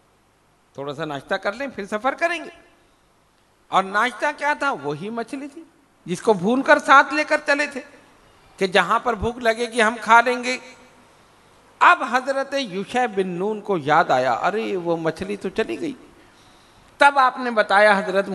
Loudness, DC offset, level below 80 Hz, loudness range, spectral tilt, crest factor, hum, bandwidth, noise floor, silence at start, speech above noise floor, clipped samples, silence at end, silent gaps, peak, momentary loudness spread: -20 LUFS; under 0.1%; -54 dBFS; 6 LU; -4 dB/octave; 22 dB; none; 12 kHz; -59 dBFS; 0.8 s; 39 dB; under 0.1%; 0 s; none; 0 dBFS; 14 LU